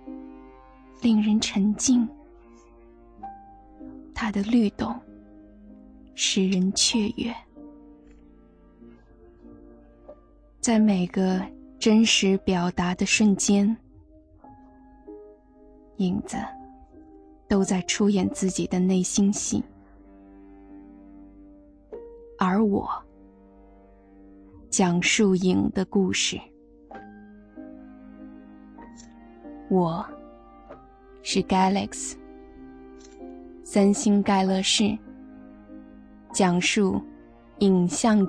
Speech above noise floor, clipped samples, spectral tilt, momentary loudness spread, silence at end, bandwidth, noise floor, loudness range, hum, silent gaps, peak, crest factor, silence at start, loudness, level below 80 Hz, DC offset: 31 dB; under 0.1%; -4.5 dB/octave; 25 LU; 0 s; 10.5 kHz; -54 dBFS; 10 LU; none; none; -8 dBFS; 18 dB; 0.05 s; -23 LUFS; -52 dBFS; under 0.1%